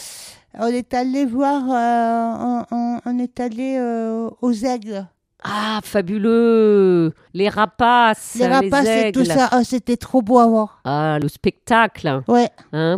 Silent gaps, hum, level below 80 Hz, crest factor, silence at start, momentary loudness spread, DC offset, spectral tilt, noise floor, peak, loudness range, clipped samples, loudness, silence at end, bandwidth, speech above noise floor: none; none; -52 dBFS; 16 dB; 0 s; 10 LU; under 0.1%; -5.5 dB/octave; -38 dBFS; -2 dBFS; 7 LU; under 0.1%; -18 LUFS; 0 s; 15 kHz; 21 dB